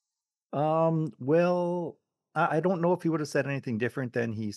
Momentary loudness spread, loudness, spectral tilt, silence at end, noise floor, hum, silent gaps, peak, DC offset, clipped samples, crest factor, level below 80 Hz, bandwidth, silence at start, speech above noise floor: 7 LU; -28 LUFS; -7.5 dB/octave; 0 s; -90 dBFS; none; none; -12 dBFS; under 0.1%; under 0.1%; 16 dB; -78 dBFS; 12.5 kHz; 0.5 s; 62 dB